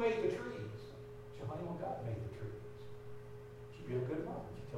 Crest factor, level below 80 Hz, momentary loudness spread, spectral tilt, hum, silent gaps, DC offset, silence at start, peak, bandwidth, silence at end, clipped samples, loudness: 20 dB; -62 dBFS; 14 LU; -7.5 dB/octave; none; none; under 0.1%; 0 s; -22 dBFS; 15.5 kHz; 0 s; under 0.1%; -44 LUFS